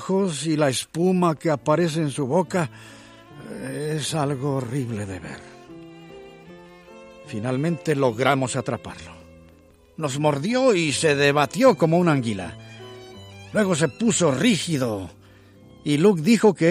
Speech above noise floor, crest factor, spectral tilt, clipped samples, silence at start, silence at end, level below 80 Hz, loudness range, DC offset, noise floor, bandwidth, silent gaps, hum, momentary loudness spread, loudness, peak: 31 dB; 20 dB; -5 dB/octave; under 0.1%; 0 s; 0 s; -60 dBFS; 9 LU; under 0.1%; -53 dBFS; 15.5 kHz; none; none; 22 LU; -22 LUFS; -4 dBFS